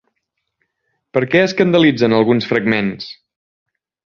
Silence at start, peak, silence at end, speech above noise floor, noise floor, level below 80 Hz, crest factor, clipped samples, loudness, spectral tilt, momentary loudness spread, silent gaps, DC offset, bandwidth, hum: 1.15 s; -2 dBFS; 1 s; 60 dB; -74 dBFS; -56 dBFS; 16 dB; under 0.1%; -15 LUFS; -6.5 dB/octave; 10 LU; none; under 0.1%; 7.2 kHz; none